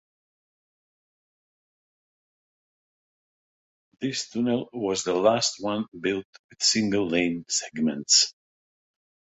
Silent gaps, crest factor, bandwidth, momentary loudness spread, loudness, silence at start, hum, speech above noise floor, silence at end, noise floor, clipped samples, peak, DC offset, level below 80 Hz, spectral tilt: 5.88-5.92 s, 6.25-6.33 s, 6.39-6.49 s; 24 dB; 8.4 kHz; 11 LU; -24 LUFS; 4 s; none; over 65 dB; 0.9 s; under -90 dBFS; under 0.1%; -6 dBFS; under 0.1%; -66 dBFS; -2.5 dB/octave